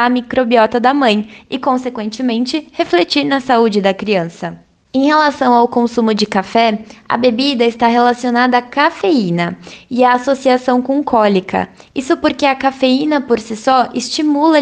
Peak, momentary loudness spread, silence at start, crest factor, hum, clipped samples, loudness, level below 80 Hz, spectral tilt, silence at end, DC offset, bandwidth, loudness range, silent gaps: 0 dBFS; 8 LU; 0 s; 14 dB; none; under 0.1%; -14 LUFS; -52 dBFS; -5 dB/octave; 0 s; under 0.1%; 9.4 kHz; 2 LU; none